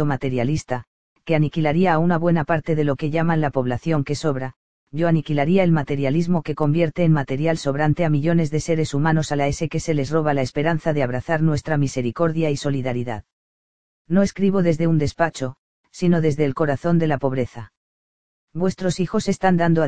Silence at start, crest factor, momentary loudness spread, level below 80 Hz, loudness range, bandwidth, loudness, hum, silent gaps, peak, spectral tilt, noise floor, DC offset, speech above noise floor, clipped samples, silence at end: 0 s; 18 dB; 6 LU; -46 dBFS; 3 LU; 9.2 kHz; -21 LUFS; none; 0.87-1.16 s, 4.56-4.87 s, 13.33-14.05 s, 15.58-15.84 s, 17.77-18.48 s; -2 dBFS; -7 dB/octave; under -90 dBFS; 2%; over 70 dB; under 0.1%; 0 s